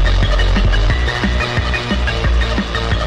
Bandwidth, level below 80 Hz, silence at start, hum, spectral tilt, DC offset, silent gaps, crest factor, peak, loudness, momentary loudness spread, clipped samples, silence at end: 9 kHz; -16 dBFS; 0 s; none; -5.5 dB/octave; under 0.1%; none; 10 dB; -6 dBFS; -17 LUFS; 3 LU; under 0.1%; 0 s